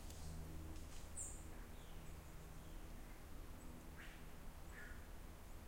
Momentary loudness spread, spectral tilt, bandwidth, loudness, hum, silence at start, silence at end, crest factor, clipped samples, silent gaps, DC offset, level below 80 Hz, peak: 8 LU; -4 dB/octave; 16 kHz; -56 LUFS; none; 0 s; 0 s; 16 dB; under 0.1%; none; under 0.1%; -56 dBFS; -36 dBFS